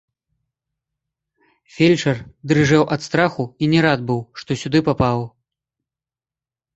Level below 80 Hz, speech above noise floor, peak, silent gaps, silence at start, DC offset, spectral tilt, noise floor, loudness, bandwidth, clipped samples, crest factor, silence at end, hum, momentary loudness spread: -50 dBFS; over 72 dB; -2 dBFS; none; 1.75 s; under 0.1%; -6 dB/octave; under -90 dBFS; -18 LUFS; 8.2 kHz; under 0.1%; 20 dB; 1.45 s; none; 10 LU